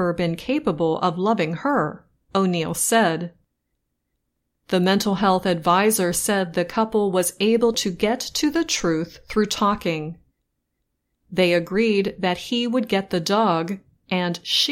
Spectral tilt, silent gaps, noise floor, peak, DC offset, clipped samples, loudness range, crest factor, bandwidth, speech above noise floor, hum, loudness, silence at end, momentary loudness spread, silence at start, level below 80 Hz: -4 dB/octave; none; -76 dBFS; -6 dBFS; under 0.1%; under 0.1%; 4 LU; 16 dB; 16.5 kHz; 55 dB; none; -21 LUFS; 0 s; 7 LU; 0 s; -52 dBFS